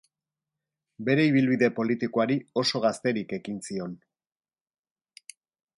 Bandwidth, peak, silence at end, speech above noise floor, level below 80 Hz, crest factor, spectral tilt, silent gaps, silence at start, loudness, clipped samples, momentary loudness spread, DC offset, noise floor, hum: 11.5 kHz; -10 dBFS; 1.8 s; over 64 dB; -72 dBFS; 18 dB; -5.5 dB/octave; none; 1 s; -26 LUFS; under 0.1%; 13 LU; under 0.1%; under -90 dBFS; none